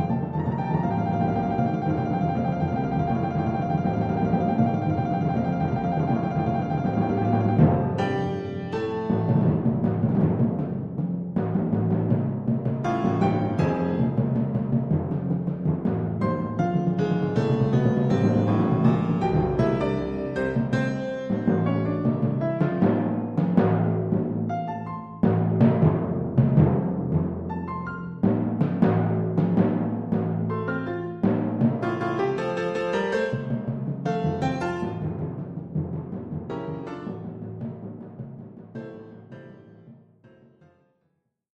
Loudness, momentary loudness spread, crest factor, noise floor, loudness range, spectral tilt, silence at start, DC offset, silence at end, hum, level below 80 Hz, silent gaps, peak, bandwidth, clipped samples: -25 LUFS; 11 LU; 18 dB; -74 dBFS; 8 LU; -9.5 dB/octave; 0 s; under 0.1%; 1.6 s; none; -48 dBFS; none; -6 dBFS; 7.8 kHz; under 0.1%